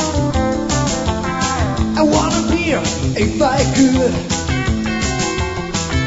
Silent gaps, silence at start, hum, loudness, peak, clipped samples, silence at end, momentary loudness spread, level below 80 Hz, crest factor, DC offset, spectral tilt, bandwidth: none; 0 s; none; -17 LUFS; -2 dBFS; under 0.1%; 0 s; 6 LU; -28 dBFS; 14 dB; 0.2%; -5 dB/octave; 8 kHz